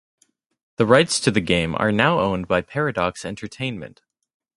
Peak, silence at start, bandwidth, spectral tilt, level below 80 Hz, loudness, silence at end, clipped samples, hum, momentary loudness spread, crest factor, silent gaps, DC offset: 0 dBFS; 0.8 s; 11.5 kHz; -4.5 dB/octave; -48 dBFS; -20 LUFS; 0.7 s; under 0.1%; none; 16 LU; 22 dB; none; under 0.1%